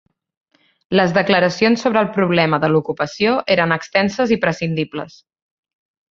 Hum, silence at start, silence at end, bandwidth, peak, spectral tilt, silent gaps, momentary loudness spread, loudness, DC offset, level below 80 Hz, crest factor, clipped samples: none; 0.9 s; 1 s; 7.6 kHz; -2 dBFS; -6 dB/octave; none; 8 LU; -17 LUFS; under 0.1%; -56 dBFS; 18 dB; under 0.1%